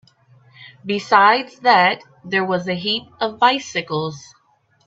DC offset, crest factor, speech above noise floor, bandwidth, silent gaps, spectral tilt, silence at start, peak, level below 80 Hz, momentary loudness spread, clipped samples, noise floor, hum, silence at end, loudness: under 0.1%; 20 dB; 42 dB; 8 kHz; none; -4 dB/octave; 0.6 s; 0 dBFS; -66 dBFS; 14 LU; under 0.1%; -60 dBFS; none; 0.65 s; -18 LUFS